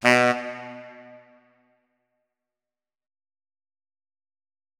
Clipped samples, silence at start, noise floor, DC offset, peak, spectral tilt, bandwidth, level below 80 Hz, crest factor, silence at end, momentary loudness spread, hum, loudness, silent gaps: under 0.1%; 0 s; under -90 dBFS; under 0.1%; -2 dBFS; -4 dB/octave; 18 kHz; -80 dBFS; 28 dB; 3.9 s; 26 LU; none; -22 LUFS; none